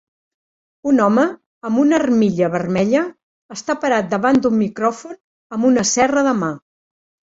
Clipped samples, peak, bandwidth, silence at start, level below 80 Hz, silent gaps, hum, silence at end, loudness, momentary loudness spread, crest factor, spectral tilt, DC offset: under 0.1%; -2 dBFS; 8 kHz; 0.85 s; -56 dBFS; 1.46-1.61 s, 3.23-3.49 s, 5.24-5.50 s; none; 0.7 s; -17 LUFS; 14 LU; 16 dB; -5 dB/octave; under 0.1%